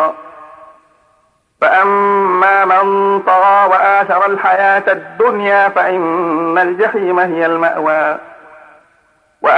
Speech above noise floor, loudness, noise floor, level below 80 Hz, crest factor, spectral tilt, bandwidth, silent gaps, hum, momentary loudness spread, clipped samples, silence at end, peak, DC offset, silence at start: 44 dB; -12 LUFS; -57 dBFS; -66 dBFS; 12 dB; -6.5 dB/octave; 9.8 kHz; none; none; 6 LU; under 0.1%; 0 s; 0 dBFS; under 0.1%; 0 s